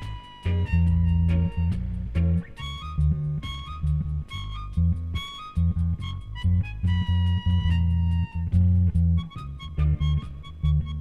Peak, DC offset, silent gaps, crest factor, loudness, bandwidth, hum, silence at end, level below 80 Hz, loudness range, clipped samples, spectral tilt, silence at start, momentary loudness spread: -10 dBFS; under 0.1%; none; 14 dB; -26 LUFS; 4.7 kHz; none; 0 s; -30 dBFS; 4 LU; under 0.1%; -8 dB/octave; 0 s; 11 LU